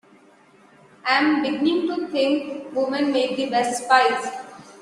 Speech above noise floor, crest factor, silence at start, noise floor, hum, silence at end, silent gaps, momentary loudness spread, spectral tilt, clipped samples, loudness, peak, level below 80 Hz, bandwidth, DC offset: 32 dB; 20 dB; 1.05 s; -53 dBFS; none; 0.05 s; none; 12 LU; -3 dB/octave; under 0.1%; -21 LUFS; -2 dBFS; -70 dBFS; 12.5 kHz; under 0.1%